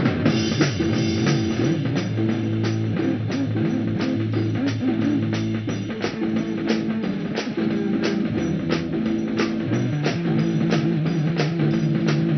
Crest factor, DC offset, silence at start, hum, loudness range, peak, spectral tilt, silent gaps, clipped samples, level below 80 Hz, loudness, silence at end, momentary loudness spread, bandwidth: 16 dB; under 0.1%; 0 s; none; 2 LU; -6 dBFS; -6.5 dB/octave; none; under 0.1%; -50 dBFS; -23 LUFS; 0 s; 4 LU; 6.4 kHz